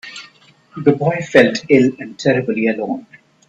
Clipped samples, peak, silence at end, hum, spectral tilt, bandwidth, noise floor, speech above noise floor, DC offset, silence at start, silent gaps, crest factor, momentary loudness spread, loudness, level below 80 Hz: under 0.1%; 0 dBFS; 0.5 s; none; -6 dB/octave; 8.4 kHz; -49 dBFS; 33 dB; under 0.1%; 0.05 s; none; 16 dB; 16 LU; -16 LUFS; -58 dBFS